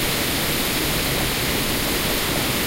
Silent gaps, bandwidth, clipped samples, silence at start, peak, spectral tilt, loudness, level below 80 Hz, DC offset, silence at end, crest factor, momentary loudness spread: none; 16 kHz; under 0.1%; 0 s; -10 dBFS; -3 dB/octave; -20 LUFS; -34 dBFS; under 0.1%; 0 s; 12 dB; 0 LU